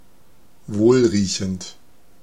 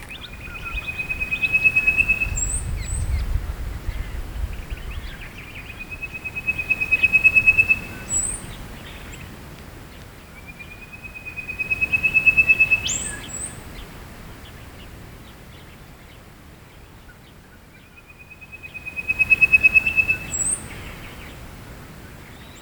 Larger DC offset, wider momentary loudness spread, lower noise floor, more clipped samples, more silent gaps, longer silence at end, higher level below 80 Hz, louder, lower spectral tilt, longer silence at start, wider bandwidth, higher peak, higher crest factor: first, 0.7% vs under 0.1%; second, 16 LU vs 26 LU; first, -56 dBFS vs -46 dBFS; neither; neither; first, 0.5 s vs 0 s; second, -54 dBFS vs -36 dBFS; about the same, -19 LUFS vs -18 LUFS; first, -5.5 dB/octave vs -2 dB/octave; first, 0.7 s vs 0 s; second, 11.5 kHz vs over 20 kHz; about the same, -4 dBFS vs -4 dBFS; about the same, 18 dB vs 20 dB